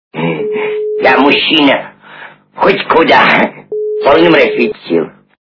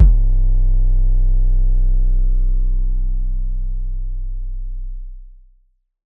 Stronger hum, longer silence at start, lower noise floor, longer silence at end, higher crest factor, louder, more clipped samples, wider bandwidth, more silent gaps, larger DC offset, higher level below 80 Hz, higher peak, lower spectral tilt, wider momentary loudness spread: neither; first, 0.15 s vs 0 s; second, -34 dBFS vs -57 dBFS; second, 0.3 s vs 0.75 s; about the same, 10 dB vs 14 dB; first, -10 LUFS vs -22 LUFS; first, 0.6% vs under 0.1%; first, 6 kHz vs 0.8 kHz; neither; neither; second, -48 dBFS vs -14 dBFS; about the same, 0 dBFS vs 0 dBFS; second, -6.5 dB/octave vs -13 dB/octave; about the same, 10 LU vs 12 LU